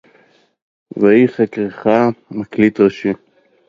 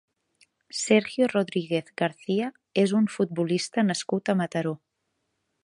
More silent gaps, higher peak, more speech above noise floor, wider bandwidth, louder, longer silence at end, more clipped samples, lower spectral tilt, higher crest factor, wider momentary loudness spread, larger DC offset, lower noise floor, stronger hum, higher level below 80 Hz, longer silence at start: neither; first, 0 dBFS vs -6 dBFS; second, 39 dB vs 53 dB; second, 7.4 kHz vs 11.5 kHz; first, -15 LUFS vs -26 LUFS; second, 0.55 s vs 0.9 s; neither; first, -8.5 dB/octave vs -5 dB/octave; about the same, 16 dB vs 20 dB; first, 14 LU vs 7 LU; neither; second, -53 dBFS vs -78 dBFS; neither; first, -56 dBFS vs -74 dBFS; first, 0.95 s vs 0.75 s